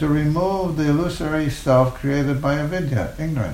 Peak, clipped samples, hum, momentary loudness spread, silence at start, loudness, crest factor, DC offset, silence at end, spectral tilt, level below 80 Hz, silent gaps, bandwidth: -4 dBFS; under 0.1%; none; 6 LU; 0 s; -21 LUFS; 16 dB; under 0.1%; 0 s; -7.5 dB/octave; -36 dBFS; none; 16 kHz